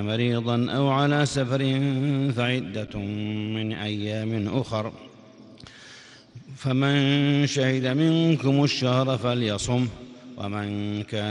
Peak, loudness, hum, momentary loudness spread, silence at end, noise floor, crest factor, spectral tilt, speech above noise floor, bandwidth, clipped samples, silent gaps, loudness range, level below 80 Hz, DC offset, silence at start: -8 dBFS; -24 LUFS; none; 11 LU; 0 s; -48 dBFS; 16 dB; -6 dB/octave; 24 dB; 10.5 kHz; under 0.1%; none; 8 LU; -56 dBFS; under 0.1%; 0 s